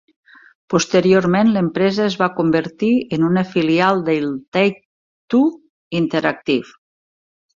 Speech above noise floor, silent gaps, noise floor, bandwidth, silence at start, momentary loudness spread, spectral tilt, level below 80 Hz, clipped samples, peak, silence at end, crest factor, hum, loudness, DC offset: over 74 dB; 4.48-4.52 s, 4.85-5.28 s, 5.69-5.91 s; under -90 dBFS; 7.6 kHz; 0.7 s; 7 LU; -6 dB/octave; -58 dBFS; under 0.1%; -2 dBFS; 0.9 s; 16 dB; none; -17 LUFS; under 0.1%